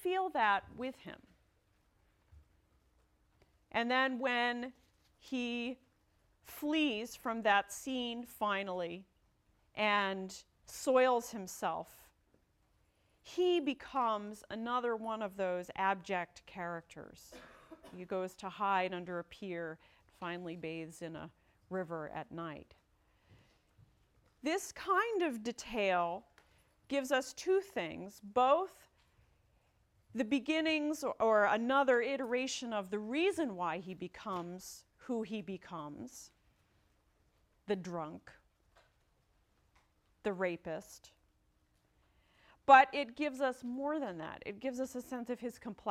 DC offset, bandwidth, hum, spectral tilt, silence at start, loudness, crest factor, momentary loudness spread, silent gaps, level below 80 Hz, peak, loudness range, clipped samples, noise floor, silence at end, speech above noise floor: under 0.1%; 16.5 kHz; none; -4 dB/octave; 0 s; -36 LUFS; 26 dB; 17 LU; none; -72 dBFS; -10 dBFS; 12 LU; under 0.1%; -74 dBFS; 0 s; 39 dB